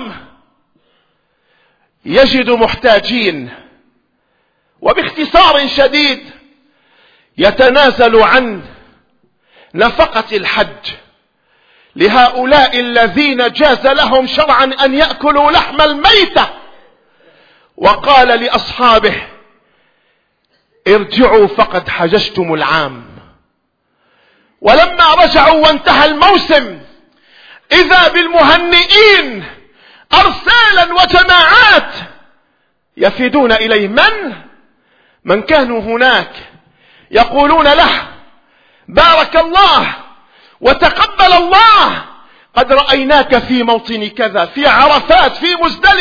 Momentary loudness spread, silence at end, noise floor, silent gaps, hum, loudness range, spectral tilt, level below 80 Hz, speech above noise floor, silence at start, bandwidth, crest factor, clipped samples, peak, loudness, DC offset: 11 LU; 0 s; -63 dBFS; none; none; 6 LU; -4.5 dB/octave; -34 dBFS; 54 dB; 0 s; 5.4 kHz; 10 dB; 0.7%; 0 dBFS; -8 LUFS; under 0.1%